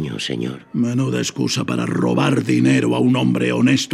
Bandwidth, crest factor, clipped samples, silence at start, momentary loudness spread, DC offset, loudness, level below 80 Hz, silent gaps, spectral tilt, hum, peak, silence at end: 13.5 kHz; 14 dB; under 0.1%; 0 s; 8 LU; under 0.1%; -18 LUFS; -60 dBFS; none; -5.5 dB/octave; none; -2 dBFS; 0 s